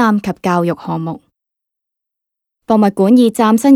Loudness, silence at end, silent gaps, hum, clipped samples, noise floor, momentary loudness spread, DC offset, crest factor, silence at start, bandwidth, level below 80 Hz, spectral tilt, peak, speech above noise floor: -13 LUFS; 0 s; none; none; under 0.1%; -81 dBFS; 12 LU; under 0.1%; 14 dB; 0 s; 15 kHz; -56 dBFS; -6.5 dB/octave; 0 dBFS; 69 dB